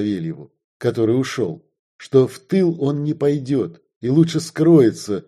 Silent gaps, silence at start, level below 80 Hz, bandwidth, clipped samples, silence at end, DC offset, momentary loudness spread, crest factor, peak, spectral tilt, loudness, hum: 0.64-0.80 s, 1.79-1.99 s, 3.96-4.01 s; 0 s; -60 dBFS; 13 kHz; under 0.1%; 0.05 s; under 0.1%; 13 LU; 16 dB; -2 dBFS; -7 dB/octave; -19 LUFS; none